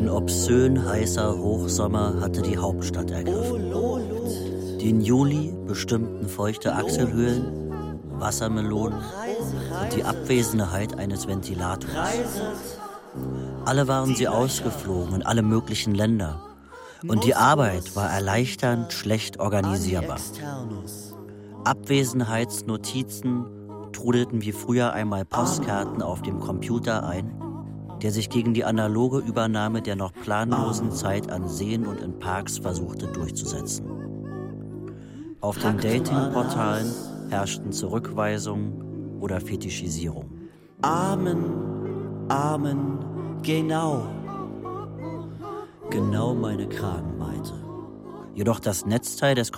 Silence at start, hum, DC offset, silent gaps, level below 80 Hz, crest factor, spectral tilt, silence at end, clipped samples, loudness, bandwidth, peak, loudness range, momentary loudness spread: 0 s; none; under 0.1%; none; -46 dBFS; 20 dB; -5.5 dB/octave; 0 s; under 0.1%; -26 LUFS; 16.5 kHz; -6 dBFS; 6 LU; 12 LU